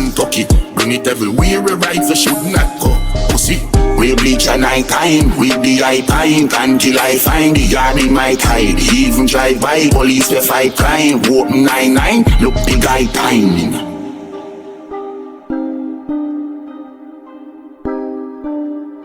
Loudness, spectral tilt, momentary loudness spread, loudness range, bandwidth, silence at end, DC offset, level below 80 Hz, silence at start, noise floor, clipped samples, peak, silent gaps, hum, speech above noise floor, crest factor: -12 LUFS; -4 dB/octave; 14 LU; 13 LU; over 20 kHz; 0 s; under 0.1%; -20 dBFS; 0 s; -34 dBFS; under 0.1%; 0 dBFS; none; none; 23 dB; 12 dB